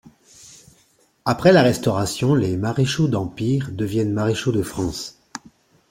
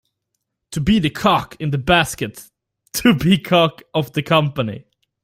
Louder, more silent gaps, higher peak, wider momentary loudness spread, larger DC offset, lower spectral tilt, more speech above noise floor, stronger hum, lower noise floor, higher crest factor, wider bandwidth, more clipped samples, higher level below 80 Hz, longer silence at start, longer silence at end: about the same, -20 LUFS vs -18 LUFS; neither; about the same, -2 dBFS vs 0 dBFS; first, 15 LU vs 12 LU; neither; about the same, -6 dB/octave vs -5 dB/octave; second, 40 dB vs 59 dB; neither; second, -60 dBFS vs -76 dBFS; about the same, 20 dB vs 18 dB; about the same, 16.5 kHz vs 16 kHz; neither; second, -50 dBFS vs -44 dBFS; second, 0.45 s vs 0.7 s; about the same, 0.55 s vs 0.45 s